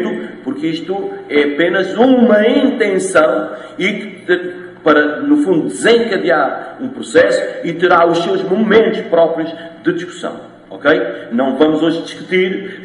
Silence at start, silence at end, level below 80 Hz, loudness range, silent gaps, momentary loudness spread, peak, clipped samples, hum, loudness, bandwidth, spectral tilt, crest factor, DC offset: 0 s; 0 s; -58 dBFS; 3 LU; none; 13 LU; 0 dBFS; under 0.1%; none; -14 LUFS; 11.5 kHz; -5 dB/octave; 14 dB; under 0.1%